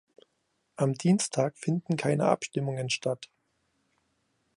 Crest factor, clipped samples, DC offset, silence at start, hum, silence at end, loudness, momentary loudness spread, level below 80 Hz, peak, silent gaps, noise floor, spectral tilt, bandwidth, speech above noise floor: 22 dB; under 0.1%; under 0.1%; 0.8 s; none; 1.3 s; -29 LUFS; 6 LU; -74 dBFS; -8 dBFS; none; -76 dBFS; -5.5 dB/octave; 11.5 kHz; 48 dB